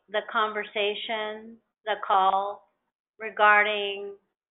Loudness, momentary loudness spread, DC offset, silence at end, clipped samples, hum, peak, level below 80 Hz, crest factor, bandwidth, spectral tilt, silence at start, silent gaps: -25 LUFS; 19 LU; under 0.1%; 0.35 s; under 0.1%; none; -8 dBFS; -78 dBFS; 20 dB; 4.1 kHz; 1.5 dB/octave; 0.1 s; 2.95-3.05 s